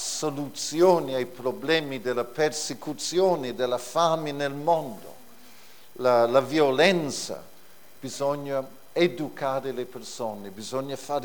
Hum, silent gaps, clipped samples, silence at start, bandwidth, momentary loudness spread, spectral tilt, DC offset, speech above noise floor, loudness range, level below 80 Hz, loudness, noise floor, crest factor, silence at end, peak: none; none; under 0.1%; 0 s; over 20 kHz; 13 LU; -4 dB/octave; 0.5%; 28 dB; 5 LU; -70 dBFS; -26 LUFS; -54 dBFS; 22 dB; 0 s; -4 dBFS